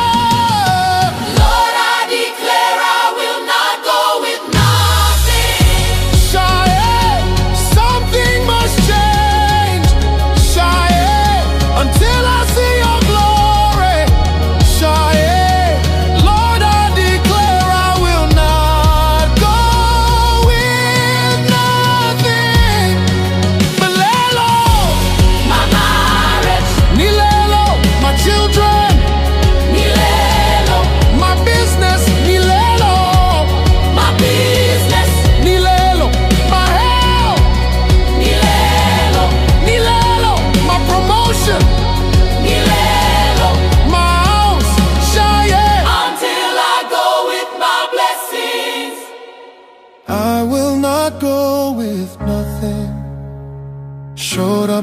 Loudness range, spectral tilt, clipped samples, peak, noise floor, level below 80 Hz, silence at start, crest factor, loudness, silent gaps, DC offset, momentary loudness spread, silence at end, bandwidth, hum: 5 LU; -4.5 dB/octave; under 0.1%; 0 dBFS; -42 dBFS; -16 dBFS; 0 s; 12 dB; -12 LUFS; none; under 0.1%; 4 LU; 0 s; 15.5 kHz; none